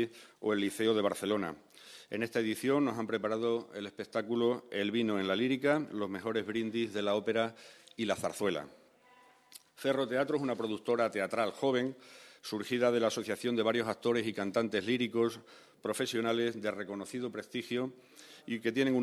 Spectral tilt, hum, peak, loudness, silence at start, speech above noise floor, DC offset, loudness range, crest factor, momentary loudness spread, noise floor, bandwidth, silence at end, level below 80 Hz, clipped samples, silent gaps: -5 dB/octave; none; -14 dBFS; -33 LUFS; 0 s; 29 dB; under 0.1%; 3 LU; 18 dB; 11 LU; -62 dBFS; 14 kHz; 0 s; -78 dBFS; under 0.1%; none